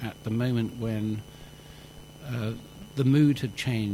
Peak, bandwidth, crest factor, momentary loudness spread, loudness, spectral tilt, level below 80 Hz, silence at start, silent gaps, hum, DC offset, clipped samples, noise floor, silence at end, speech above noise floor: -12 dBFS; 16.5 kHz; 18 dB; 25 LU; -28 LUFS; -7 dB/octave; -54 dBFS; 0 s; none; none; under 0.1%; under 0.1%; -47 dBFS; 0 s; 20 dB